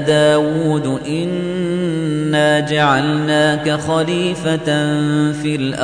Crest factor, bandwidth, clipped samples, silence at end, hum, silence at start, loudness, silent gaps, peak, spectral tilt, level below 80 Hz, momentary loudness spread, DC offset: 14 dB; 10 kHz; under 0.1%; 0 s; none; 0 s; -16 LUFS; none; -2 dBFS; -5.5 dB/octave; -48 dBFS; 6 LU; under 0.1%